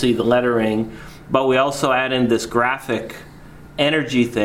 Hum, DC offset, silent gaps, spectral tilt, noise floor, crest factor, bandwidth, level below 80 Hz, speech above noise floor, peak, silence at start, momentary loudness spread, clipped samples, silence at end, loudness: none; under 0.1%; none; -5 dB/octave; -40 dBFS; 18 dB; 16 kHz; -48 dBFS; 22 dB; -2 dBFS; 0 s; 14 LU; under 0.1%; 0 s; -19 LUFS